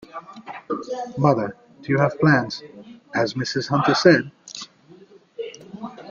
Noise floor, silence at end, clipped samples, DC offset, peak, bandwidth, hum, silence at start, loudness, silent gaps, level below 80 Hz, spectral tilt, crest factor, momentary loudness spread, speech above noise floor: -49 dBFS; 0 s; under 0.1%; under 0.1%; -2 dBFS; 7.4 kHz; none; 0.15 s; -21 LUFS; none; -60 dBFS; -6 dB/octave; 22 dB; 22 LU; 29 dB